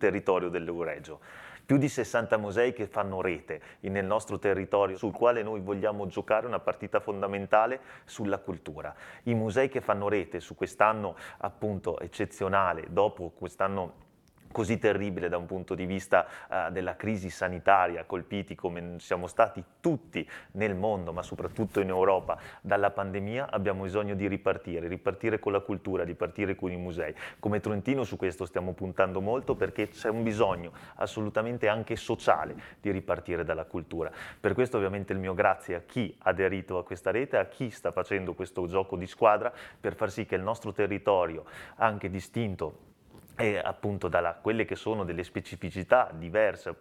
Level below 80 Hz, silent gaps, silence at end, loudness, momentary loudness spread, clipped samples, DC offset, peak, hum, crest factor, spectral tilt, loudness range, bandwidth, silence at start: -58 dBFS; none; 0.05 s; -30 LUFS; 11 LU; under 0.1%; under 0.1%; -6 dBFS; none; 24 dB; -6.5 dB/octave; 2 LU; 14.5 kHz; 0 s